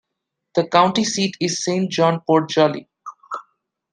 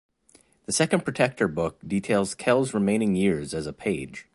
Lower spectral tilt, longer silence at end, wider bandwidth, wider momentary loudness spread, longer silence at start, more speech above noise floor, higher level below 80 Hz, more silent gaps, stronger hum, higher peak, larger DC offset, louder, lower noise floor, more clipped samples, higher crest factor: about the same, -4.5 dB/octave vs -5 dB/octave; first, 0.5 s vs 0.15 s; about the same, 10.5 kHz vs 11.5 kHz; first, 17 LU vs 7 LU; second, 0.55 s vs 0.7 s; first, 61 dB vs 35 dB; second, -66 dBFS vs -54 dBFS; neither; neither; about the same, -2 dBFS vs -4 dBFS; neither; first, -19 LUFS vs -25 LUFS; first, -80 dBFS vs -60 dBFS; neither; about the same, 20 dB vs 20 dB